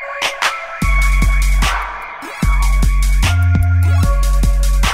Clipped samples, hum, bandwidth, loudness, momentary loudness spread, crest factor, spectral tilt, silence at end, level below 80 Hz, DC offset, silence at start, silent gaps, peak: under 0.1%; none; 15.5 kHz; -16 LUFS; 7 LU; 12 dB; -4.5 dB/octave; 0 s; -14 dBFS; under 0.1%; 0 s; none; 0 dBFS